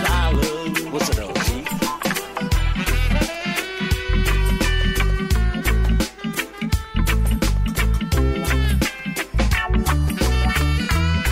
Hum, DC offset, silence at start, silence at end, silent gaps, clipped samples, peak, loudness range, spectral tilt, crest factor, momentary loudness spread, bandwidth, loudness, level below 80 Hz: none; under 0.1%; 0 s; 0 s; none; under 0.1%; -8 dBFS; 2 LU; -5 dB/octave; 12 dB; 4 LU; 16.5 kHz; -21 LUFS; -22 dBFS